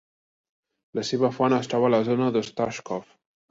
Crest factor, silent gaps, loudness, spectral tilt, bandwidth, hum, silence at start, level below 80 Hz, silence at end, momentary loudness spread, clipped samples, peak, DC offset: 18 dB; none; -25 LUFS; -6 dB/octave; 7.8 kHz; none; 0.95 s; -66 dBFS; 0.5 s; 12 LU; under 0.1%; -8 dBFS; under 0.1%